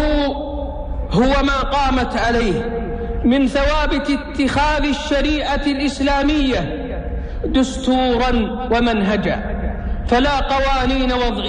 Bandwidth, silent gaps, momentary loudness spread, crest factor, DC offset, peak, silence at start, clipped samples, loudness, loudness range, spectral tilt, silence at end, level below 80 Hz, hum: 10 kHz; none; 9 LU; 12 dB; under 0.1%; -4 dBFS; 0 s; under 0.1%; -18 LUFS; 1 LU; -5.5 dB/octave; 0 s; -24 dBFS; none